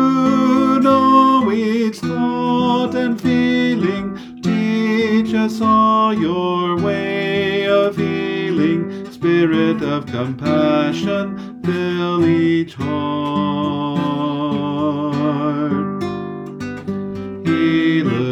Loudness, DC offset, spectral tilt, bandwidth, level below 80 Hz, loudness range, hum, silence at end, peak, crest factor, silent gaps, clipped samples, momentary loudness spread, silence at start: -17 LUFS; under 0.1%; -7 dB/octave; 12 kHz; -56 dBFS; 5 LU; none; 0 s; -2 dBFS; 14 dB; none; under 0.1%; 10 LU; 0 s